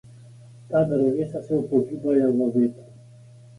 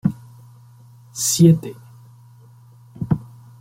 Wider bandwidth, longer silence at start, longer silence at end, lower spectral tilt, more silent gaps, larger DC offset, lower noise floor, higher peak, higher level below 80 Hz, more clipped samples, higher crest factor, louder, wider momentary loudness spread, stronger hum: second, 11 kHz vs 16.5 kHz; about the same, 0.15 s vs 0.05 s; first, 0.65 s vs 0.35 s; first, -10 dB/octave vs -5.5 dB/octave; neither; neither; about the same, -47 dBFS vs -47 dBFS; second, -8 dBFS vs -2 dBFS; second, -60 dBFS vs -52 dBFS; neither; about the same, 16 dB vs 20 dB; second, -23 LUFS vs -18 LUFS; second, 5 LU vs 22 LU; neither